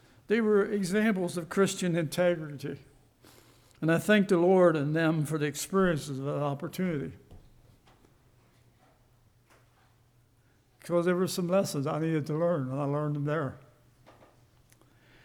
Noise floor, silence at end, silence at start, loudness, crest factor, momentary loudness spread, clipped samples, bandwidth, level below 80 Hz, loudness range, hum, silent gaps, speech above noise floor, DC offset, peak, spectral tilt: -65 dBFS; 1.7 s; 0.3 s; -28 LUFS; 18 dB; 10 LU; under 0.1%; 19.5 kHz; -62 dBFS; 10 LU; none; none; 37 dB; under 0.1%; -12 dBFS; -6 dB/octave